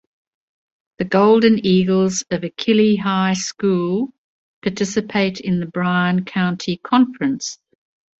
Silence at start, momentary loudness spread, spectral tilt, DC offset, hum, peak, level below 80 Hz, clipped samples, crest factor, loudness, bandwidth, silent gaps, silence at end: 1 s; 11 LU; -5.5 dB/octave; under 0.1%; none; -2 dBFS; -56 dBFS; under 0.1%; 16 dB; -18 LUFS; 8 kHz; 4.18-4.62 s; 0.65 s